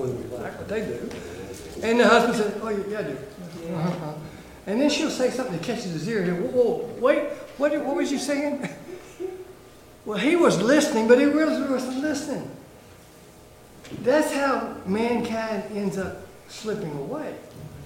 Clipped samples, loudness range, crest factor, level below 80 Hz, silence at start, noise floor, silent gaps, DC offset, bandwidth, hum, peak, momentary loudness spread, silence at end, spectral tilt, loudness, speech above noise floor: under 0.1%; 6 LU; 22 dB; -56 dBFS; 0 s; -48 dBFS; none; under 0.1%; 16.5 kHz; none; -2 dBFS; 18 LU; 0 s; -5 dB/octave; -24 LUFS; 24 dB